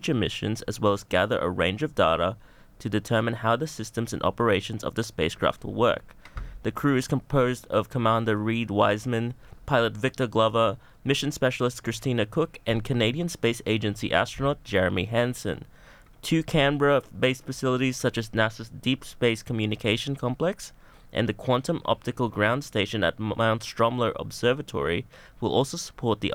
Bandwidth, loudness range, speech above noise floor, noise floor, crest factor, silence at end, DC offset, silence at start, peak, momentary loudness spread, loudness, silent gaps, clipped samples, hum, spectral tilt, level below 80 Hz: 17 kHz; 2 LU; 25 dB; -51 dBFS; 20 dB; 0 s; under 0.1%; 0 s; -6 dBFS; 8 LU; -26 LUFS; none; under 0.1%; none; -5.5 dB/octave; -50 dBFS